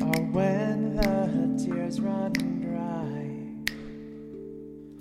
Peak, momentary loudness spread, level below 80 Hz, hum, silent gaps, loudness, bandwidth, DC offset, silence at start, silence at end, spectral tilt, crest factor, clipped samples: -6 dBFS; 16 LU; -46 dBFS; none; none; -28 LUFS; 16 kHz; under 0.1%; 0 s; 0 s; -6.5 dB/octave; 22 dB; under 0.1%